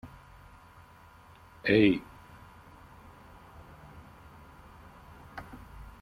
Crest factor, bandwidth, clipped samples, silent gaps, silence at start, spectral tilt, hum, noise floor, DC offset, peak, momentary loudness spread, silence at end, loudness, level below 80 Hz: 24 dB; 15 kHz; under 0.1%; none; 0.05 s; -7 dB/octave; none; -55 dBFS; under 0.1%; -10 dBFS; 29 LU; 0.2 s; -26 LUFS; -56 dBFS